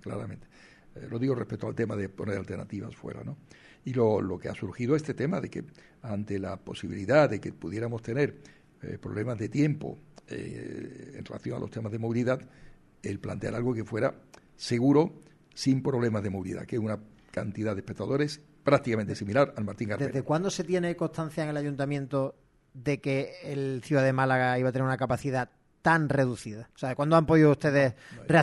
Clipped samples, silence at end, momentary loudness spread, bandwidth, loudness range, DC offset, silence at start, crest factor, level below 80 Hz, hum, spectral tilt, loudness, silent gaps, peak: under 0.1%; 0 s; 16 LU; 12 kHz; 7 LU; under 0.1%; 0.05 s; 20 dB; -60 dBFS; none; -7 dB/octave; -29 LUFS; none; -8 dBFS